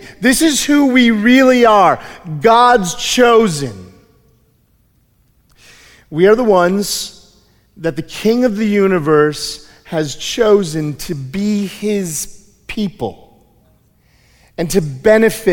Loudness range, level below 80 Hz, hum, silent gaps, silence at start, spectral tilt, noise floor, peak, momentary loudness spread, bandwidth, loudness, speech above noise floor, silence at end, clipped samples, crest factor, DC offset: 11 LU; -42 dBFS; none; none; 0 s; -4.5 dB/octave; -56 dBFS; 0 dBFS; 15 LU; 18 kHz; -13 LUFS; 43 dB; 0 s; under 0.1%; 14 dB; under 0.1%